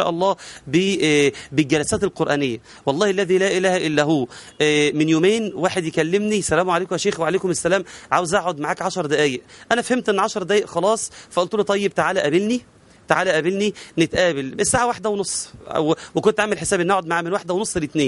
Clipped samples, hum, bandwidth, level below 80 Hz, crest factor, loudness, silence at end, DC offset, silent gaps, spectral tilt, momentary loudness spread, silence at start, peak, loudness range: under 0.1%; none; 11.5 kHz; -52 dBFS; 20 dB; -20 LUFS; 0 s; under 0.1%; none; -4 dB/octave; 6 LU; 0 s; 0 dBFS; 2 LU